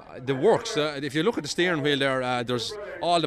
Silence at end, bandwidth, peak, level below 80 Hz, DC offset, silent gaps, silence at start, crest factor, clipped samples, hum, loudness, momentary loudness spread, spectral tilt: 0 s; 13.5 kHz; -10 dBFS; -60 dBFS; under 0.1%; none; 0 s; 16 dB; under 0.1%; none; -25 LUFS; 7 LU; -4.5 dB/octave